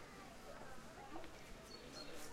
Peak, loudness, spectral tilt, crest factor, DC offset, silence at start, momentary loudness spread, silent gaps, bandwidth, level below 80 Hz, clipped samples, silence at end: -36 dBFS; -55 LUFS; -3.5 dB/octave; 16 dB; under 0.1%; 0 s; 4 LU; none; 16 kHz; -64 dBFS; under 0.1%; 0 s